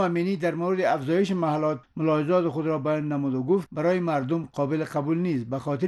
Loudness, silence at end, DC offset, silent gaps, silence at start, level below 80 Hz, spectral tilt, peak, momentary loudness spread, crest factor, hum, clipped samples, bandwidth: -26 LUFS; 0 s; under 0.1%; none; 0 s; -66 dBFS; -8 dB/octave; -12 dBFS; 4 LU; 14 dB; none; under 0.1%; 12 kHz